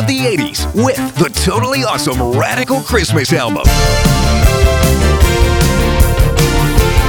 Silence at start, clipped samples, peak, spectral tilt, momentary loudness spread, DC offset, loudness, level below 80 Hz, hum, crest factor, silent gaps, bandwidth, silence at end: 0 s; under 0.1%; 0 dBFS; -5 dB/octave; 3 LU; under 0.1%; -12 LUFS; -16 dBFS; none; 12 dB; none; over 20 kHz; 0 s